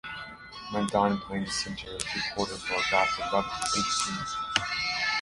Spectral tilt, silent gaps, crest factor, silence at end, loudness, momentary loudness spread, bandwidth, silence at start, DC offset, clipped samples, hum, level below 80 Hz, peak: -2.5 dB/octave; none; 26 dB; 0 s; -28 LUFS; 9 LU; 11.5 kHz; 0.05 s; under 0.1%; under 0.1%; none; -54 dBFS; -4 dBFS